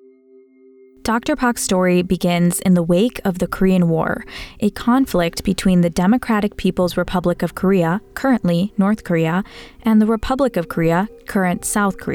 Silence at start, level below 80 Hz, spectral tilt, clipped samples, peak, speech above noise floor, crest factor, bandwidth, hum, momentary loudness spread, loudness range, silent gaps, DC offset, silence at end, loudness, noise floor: 1.05 s; -40 dBFS; -6 dB/octave; under 0.1%; -6 dBFS; 32 dB; 12 dB; 18 kHz; none; 6 LU; 1 LU; none; under 0.1%; 0 s; -18 LUFS; -49 dBFS